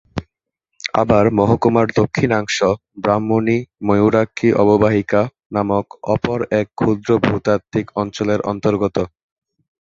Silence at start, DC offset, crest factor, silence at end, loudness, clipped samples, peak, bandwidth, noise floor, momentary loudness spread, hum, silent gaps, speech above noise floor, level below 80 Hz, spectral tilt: 0.15 s; under 0.1%; 16 dB; 0.8 s; -17 LUFS; under 0.1%; 0 dBFS; 7.8 kHz; -76 dBFS; 8 LU; none; 5.46-5.50 s; 60 dB; -44 dBFS; -6.5 dB/octave